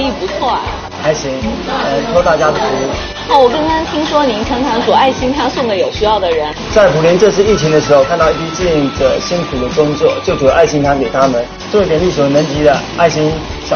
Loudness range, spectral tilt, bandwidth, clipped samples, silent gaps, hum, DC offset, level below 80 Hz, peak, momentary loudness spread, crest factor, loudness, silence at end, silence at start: 2 LU; -5 dB/octave; 6.8 kHz; 0.2%; none; none; under 0.1%; -30 dBFS; 0 dBFS; 7 LU; 12 dB; -12 LUFS; 0 s; 0 s